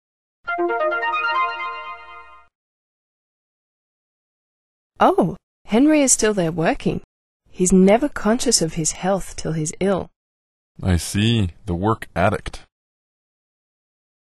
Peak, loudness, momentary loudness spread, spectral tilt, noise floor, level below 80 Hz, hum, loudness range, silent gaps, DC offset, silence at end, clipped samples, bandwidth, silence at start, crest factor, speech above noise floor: -2 dBFS; -19 LUFS; 14 LU; -4.5 dB/octave; -43 dBFS; -42 dBFS; none; 8 LU; 2.55-4.90 s, 5.43-5.65 s, 7.04-7.40 s, 10.16-10.75 s; under 0.1%; 1.75 s; under 0.1%; 12.5 kHz; 0.45 s; 20 dB; 24 dB